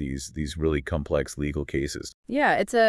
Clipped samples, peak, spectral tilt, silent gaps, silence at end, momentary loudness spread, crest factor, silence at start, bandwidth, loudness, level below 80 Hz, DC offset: under 0.1%; -8 dBFS; -5 dB/octave; 2.14-2.23 s; 0 s; 10 LU; 18 dB; 0 s; 12 kHz; -27 LUFS; -40 dBFS; under 0.1%